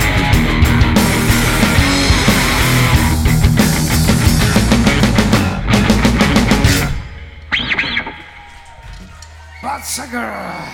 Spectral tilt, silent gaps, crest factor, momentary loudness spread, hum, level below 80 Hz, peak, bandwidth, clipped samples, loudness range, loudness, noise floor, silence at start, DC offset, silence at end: -4.5 dB/octave; none; 14 dB; 12 LU; none; -20 dBFS; 0 dBFS; 18 kHz; under 0.1%; 9 LU; -13 LUFS; -36 dBFS; 0 s; under 0.1%; 0 s